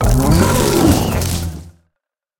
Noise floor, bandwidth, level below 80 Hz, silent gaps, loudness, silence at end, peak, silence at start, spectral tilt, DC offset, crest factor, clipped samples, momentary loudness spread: -78 dBFS; 19 kHz; -24 dBFS; none; -14 LUFS; 0.7 s; 0 dBFS; 0 s; -5.5 dB/octave; under 0.1%; 14 dB; under 0.1%; 13 LU